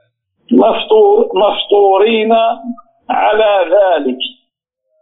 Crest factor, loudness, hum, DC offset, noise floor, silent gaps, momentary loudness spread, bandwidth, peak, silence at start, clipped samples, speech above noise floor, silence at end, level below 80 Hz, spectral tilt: 12 dB; -11 LUFS; none; under 0.1%; -70 dBFS; none; 12 LU; 4 kHz; 0 dBFS; 0.5 s; under 0.1%; 59 dB; 0.7 s; -54 dBFS; -1.5 dB/octave